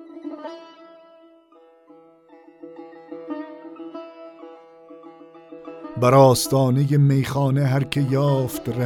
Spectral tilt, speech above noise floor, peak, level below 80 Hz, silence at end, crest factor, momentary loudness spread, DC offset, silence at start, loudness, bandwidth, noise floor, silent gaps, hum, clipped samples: -6.5 dB/octave; 35 dB; -2 dBFS; -56 dBFS; 0 s; 20 dB; 26 LU; under 0.1%; 0 s; -19 LUFS; 16 kHz; -53 dBFS; none; none; under 0.1%